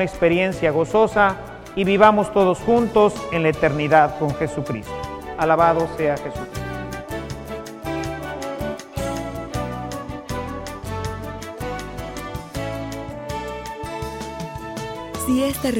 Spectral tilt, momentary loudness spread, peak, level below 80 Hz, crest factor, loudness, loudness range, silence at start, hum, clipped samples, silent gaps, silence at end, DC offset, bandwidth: -6 dB/octave; 15 LU; 0 dBFS; -40 dBFS; 22 dB; -22 LUFS; 12 LU; 0 s; none; under 0.1%; none; 0 s; under 0.1%; 17 kHz